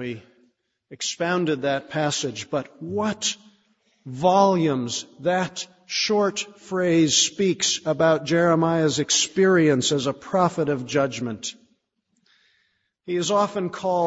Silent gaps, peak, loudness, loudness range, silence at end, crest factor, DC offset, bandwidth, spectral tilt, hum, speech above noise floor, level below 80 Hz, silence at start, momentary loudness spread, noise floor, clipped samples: none; -4 dBFS; -22 LUFS; 7 LU; 0 s; 18 dB; under 0.1%; 8 kHz; -4 dB/octave; none; 49 dB; -64 dBFS; 0 s; 11 LU; -72 dBFS; under 0.1%